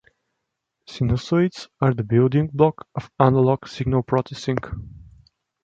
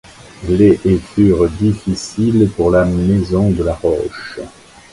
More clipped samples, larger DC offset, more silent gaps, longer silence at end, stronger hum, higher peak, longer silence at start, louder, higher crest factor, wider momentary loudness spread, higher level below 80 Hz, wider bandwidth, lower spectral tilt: neither; neither; neither; first, 0.65 s vs 0.45 s; neither; about the same, -2 dBFS vs 0 dBFS; first, 0.9 s vs 0.4 s; second, -21 LUFS vs -14 LUFS; first, 20 dB vs 14 dB; about the same, 14 LU vs 15 LU; second, -44 dBFS vs -32 dBFS; second, 7.6 kHz vs 11.5 kHz; about the same, -8 dB/octave vs -7.5 dB/octave